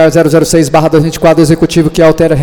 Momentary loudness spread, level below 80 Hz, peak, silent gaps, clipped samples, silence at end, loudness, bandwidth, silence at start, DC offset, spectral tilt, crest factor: 2 LU; -30 dBFS; 0 dBFS; none; 0.5%; 0 s; -7 LUFS; 19 kHz; 0 s; under 0.1%; -6 dB/octave; 6 dB